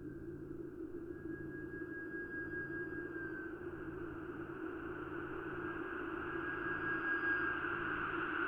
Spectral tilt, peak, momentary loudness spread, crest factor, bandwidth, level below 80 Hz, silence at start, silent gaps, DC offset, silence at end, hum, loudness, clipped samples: -7.5 dB/octave; -26 dBFS; 11 LU; 16 dB; 5.2 kHz; -62 dBFS; 0 s; none; under 0.1%; 0 s; none; -42 LUFS; under 0.1%